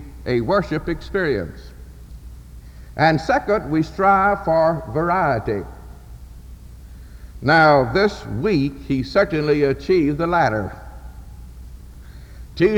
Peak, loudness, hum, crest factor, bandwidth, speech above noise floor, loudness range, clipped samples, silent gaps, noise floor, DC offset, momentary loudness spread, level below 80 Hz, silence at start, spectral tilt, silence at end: -4 dBFS; -19 LUFS; none; 16 dB; 19.5 kHz; 20 dB; 4 LU; under 0.1%; none; -39 dBFS; under 0.1%; 24 LU; -38 dBFS; 0 s; -7 dB/octave; 0 s